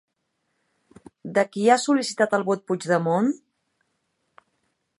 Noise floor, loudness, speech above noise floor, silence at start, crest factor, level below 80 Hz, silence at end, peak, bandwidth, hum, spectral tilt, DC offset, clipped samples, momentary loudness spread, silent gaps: -75 dBFS; -22 LUFS; 54 dB; 1.25 s; 22 dB; -74 dBFS; 1.65 s; -4 dBFS; 11.5 kHz; none; -5 dB/octave; under 0.1%; under 0.1%; 7 LU; none